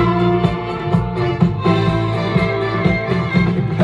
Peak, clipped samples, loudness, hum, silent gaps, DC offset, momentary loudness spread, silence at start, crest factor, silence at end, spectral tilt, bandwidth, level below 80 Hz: -2 dBFS; under 0.1%; -17 LUFS; none; none; under 0.1%; 4 LU; 0 s; 14 dB; 0 s; -8.5 dB/octave; 7.8 kHz; -34 dBFS